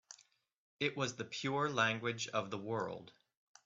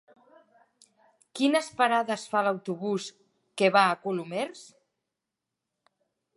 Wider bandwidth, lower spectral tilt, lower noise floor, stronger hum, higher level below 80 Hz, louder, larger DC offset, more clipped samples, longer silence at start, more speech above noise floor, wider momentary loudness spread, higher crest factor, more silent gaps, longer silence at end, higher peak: second, 7.8 kHz vs 11.5 kHz; about the same, -4 dB/octave vs -4.5 dB/octave; second, -68 dBFS vs -87 dBFS; neither; about the same, -80 dBFS vs -82 dBFS; second, -38 LUFS vs -27 LUFS; neither; neither; second, 0.1 s vs 1.35 s; second, 30 dB vs 60 dB; about the same, 14 LU vs 13 LU; about the same, 22 dB vs 22 dB; first, 0.58-0.77 s vs none; second, 0.55 s vs 1.7 s; second, -18 dBFS vs -6 dBFS